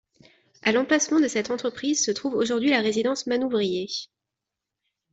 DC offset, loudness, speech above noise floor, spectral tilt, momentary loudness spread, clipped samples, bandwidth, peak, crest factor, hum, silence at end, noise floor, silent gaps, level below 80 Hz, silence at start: under 0.1%; -24 LUFS; 62 dB; -3 dB/octave; 7 LU; under 0.1%; 8.2 kHz; -8 dBFS; 16 dB; none; 1.1 s; -86 dBFS; none; -68 dBFS; 0.65 s